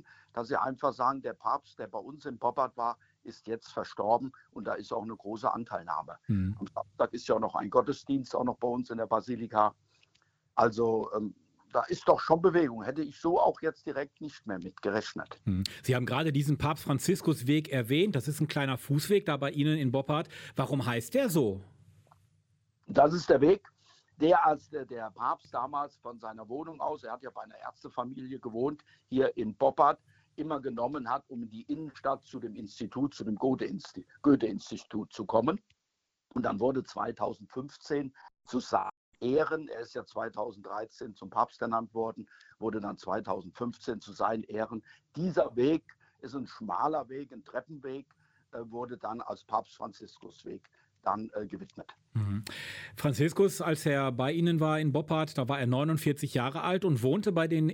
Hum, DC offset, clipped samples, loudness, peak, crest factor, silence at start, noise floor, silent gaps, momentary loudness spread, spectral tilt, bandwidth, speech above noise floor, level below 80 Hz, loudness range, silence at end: none; under 0.1%; under 0.1%; -32 LUFS; -10 dBFS; 22 dB; 0.35 s; -84 dBFS; 38.97-39.12 s; 15 LU; -6.5 dB/octave; 16 kHz; 53 dB; -66 dBFS; 8 LU; 0 s